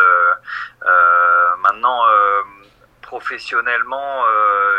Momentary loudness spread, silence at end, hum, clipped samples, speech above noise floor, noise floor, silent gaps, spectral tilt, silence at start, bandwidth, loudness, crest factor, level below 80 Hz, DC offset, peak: 15 LU; 0 s; none; under 0.1%; 31 dB; -48 dBFS; none; -2.5 dB/octave; 0 s; 8.6 kHz; -14 LUFS; 14 dB; -60 dBFS; under 0.1%; 0 dBFS